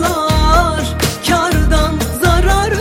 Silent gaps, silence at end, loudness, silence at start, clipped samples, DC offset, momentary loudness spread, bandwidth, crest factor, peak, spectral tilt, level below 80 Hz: none; 0 s; -14 LUFS; 0 s; under 0.1%; under 0.1%; 5 LU; 16.5 kHz; 12 dB; 0 dBFS; -4.5 dB/octave; -18 dBFS